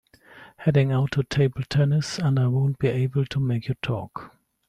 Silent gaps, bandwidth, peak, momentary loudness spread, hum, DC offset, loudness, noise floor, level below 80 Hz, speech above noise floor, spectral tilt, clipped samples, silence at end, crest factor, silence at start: none; 9.8 kHz; -8 dBFS; 7 LU; none; under 0.1%; -24 LUFS; -49 dBFS; -52 dBFS; 27 dB; -7 dB/octave; under 0.1%; 0.4 s; 14 dB; 0.35 s